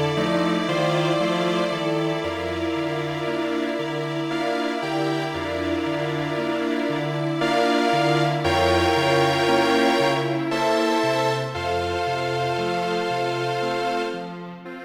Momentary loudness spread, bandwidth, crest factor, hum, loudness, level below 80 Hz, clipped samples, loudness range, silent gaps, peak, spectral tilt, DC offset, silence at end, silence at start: 7 LU; 16.5 kHz; 16 dB; none; -23 LUFS; -52 dBFS; under 0.1%; 5 LU; none; -8 dBFS; -5.5 dB/octave; under 0.1%; 0 s; 0 s